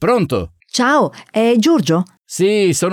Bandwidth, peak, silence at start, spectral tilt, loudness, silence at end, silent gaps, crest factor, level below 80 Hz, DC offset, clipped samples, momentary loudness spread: 17 kHz; -4 dBFS; 0 s; -5 dB/octave; -15 LUFS; 0 s; 2.18-2.25 s; 12 dB; -48 dBFS; under 0.1%; under 0.1%; 8 LU